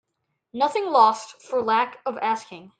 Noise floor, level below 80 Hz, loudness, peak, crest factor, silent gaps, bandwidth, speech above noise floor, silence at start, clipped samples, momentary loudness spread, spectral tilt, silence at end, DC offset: -78 dBFS; -74 dBFS; -22 LUFS; -6 dBFS; 18 dB; none; 9.2 kHz; 55 dB; 0.55 s; under 0.1%; 12 LU; -3.5 dB/octave; 0.1 s; under 0.1%